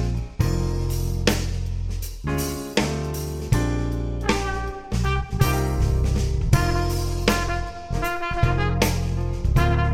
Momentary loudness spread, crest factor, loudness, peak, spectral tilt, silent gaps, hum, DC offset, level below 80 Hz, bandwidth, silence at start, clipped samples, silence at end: 7 LU; 20 dB; -24 LUFS; -2 dBFS; -5.5 dB/octave; none; none; under 0.1%; -26 dBFS; 17 kHz; 0 s; under 0.1%; 0 s